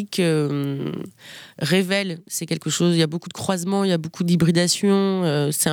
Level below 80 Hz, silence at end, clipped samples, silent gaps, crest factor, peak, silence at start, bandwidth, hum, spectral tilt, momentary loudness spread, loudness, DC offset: -60 dBFS; 0 s; under 0.1%; none; 16 dB; -6 dBFS; 0 s; 19 kHz; none; -5 dB/octave; 10 LU; -21 LUFS; under 0.1%